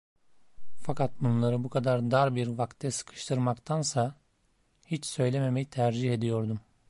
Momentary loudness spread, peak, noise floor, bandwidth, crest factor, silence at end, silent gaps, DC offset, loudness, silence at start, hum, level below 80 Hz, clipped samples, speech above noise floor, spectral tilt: 9 LU; -12 dBFS; -70 dBFS; 11.5 kHz; 16 dB; 0 s; none; under 0.1%; -30 LUFS; 0.15 s; none; -64 dBFS; under 0.1%; 41 dB; -6 dB/octave